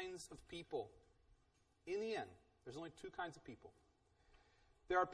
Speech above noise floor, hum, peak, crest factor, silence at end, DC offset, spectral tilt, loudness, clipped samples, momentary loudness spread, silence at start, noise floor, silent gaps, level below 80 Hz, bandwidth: 28 dB; none; -24 dBFS; 24 dB; 0 s; under 0.1%; -4.5 dB/octave; -48 LUFS; under 0.1%; 18 LU; 0 s; -78 dBFS; none; -72 dBFS; 11 kHz